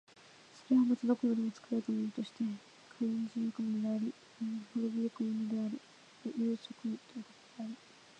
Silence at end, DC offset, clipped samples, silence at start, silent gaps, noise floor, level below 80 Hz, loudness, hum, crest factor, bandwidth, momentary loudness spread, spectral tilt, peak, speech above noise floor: 0.45 s; under 0.1%; under 0.1%; 0.55 s; none; -59 dBFS; -88 dBFS; -36 LUFS; none; 18 dB; 8.8 kHz; 16 LU; -7 dB/octave; -18 dBFS; 23 dB